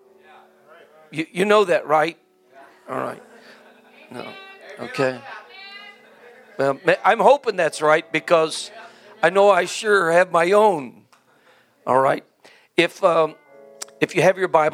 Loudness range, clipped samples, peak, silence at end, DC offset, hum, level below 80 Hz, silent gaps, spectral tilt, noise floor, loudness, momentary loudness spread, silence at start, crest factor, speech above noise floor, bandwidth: 12 LU; under 0.1%; 0 dBFS; 0 s; under 0.1%; none; -76 dBFS; none; -4.5 dB/octave; -56 dBFS; -19 LUFS; 22 LU; 1.1 s; 20 dB; 38 dB; 16 kHz